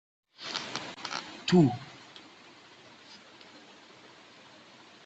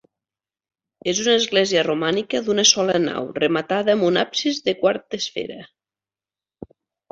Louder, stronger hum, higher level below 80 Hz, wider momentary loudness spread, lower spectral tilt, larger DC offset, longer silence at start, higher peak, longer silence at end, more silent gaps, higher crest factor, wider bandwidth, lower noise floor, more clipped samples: second, -30 LUFS vs -20 LUFS; neither; second, -70 dBFS vs -62 dBFS; first, 28 LU vs 11 LU; first, -6 dB/octave vs -2.5 dB/octave; neither; second, 0.4 s vs 1.05 s; second, -10 dBFS vs 0 dBFS; first, 1.45 s vs 0.45 s; neither; about the same, 24 dB vs 22 dB; about the same, 8.2 kHz vs 8 kHz; second, -54 dBFS vs under -90 dBFS; neither